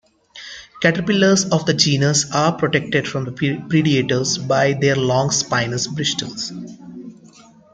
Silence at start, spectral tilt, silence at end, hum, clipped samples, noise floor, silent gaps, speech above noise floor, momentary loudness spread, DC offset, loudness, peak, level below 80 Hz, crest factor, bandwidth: 0.35 s; -4 dB/octave; 0.45 s; none; under 0.1%; -46 dBFS; none; 28 dB; 19 LU; under 0.1%; -18 LUFS; -2 dBFS; -54 dBFS; 18 dB; 9.6 kHz